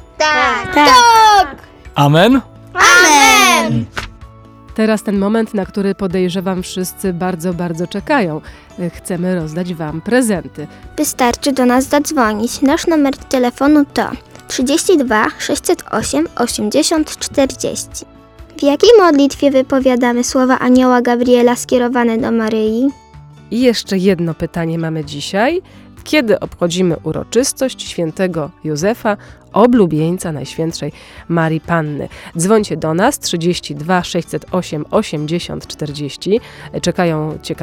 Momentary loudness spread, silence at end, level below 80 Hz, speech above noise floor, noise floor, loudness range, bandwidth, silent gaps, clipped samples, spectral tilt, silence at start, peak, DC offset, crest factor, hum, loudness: 13 LU; 0 s; -42 dBFS; 24 dB; -38 dBFS; 8 LU; 19.5 kHz; none; under 0.1%; -4.5 dB/octave; 0.2 s; 0 dBFS; under 0.1%; 14 dB; none; -14 LUFS